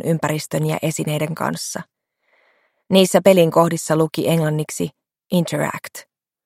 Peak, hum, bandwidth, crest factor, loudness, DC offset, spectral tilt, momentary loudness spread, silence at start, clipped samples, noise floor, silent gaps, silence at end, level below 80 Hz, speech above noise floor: 0 dBFS; none; 16 kHz; 20 dB; -19 LUFS; under 0.1%; -5.5 dB/octave; 15 LU; 0.05 s; under 0.1%; -64 dBFS; none; 0.45 s; -62 dBFS; 46 dB